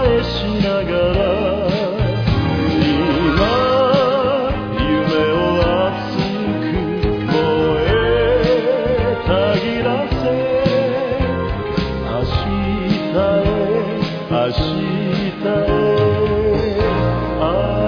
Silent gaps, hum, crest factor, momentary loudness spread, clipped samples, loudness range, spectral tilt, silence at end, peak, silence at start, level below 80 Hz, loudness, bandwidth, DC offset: none; none; 16 dB; 5 LU; under 0.1%; 3 LU; -8 dB/octave; 0 s; 0 dBFS; 0 s; -30 dBFS; -17 LUFS; 5.4 kHz; under 0.1%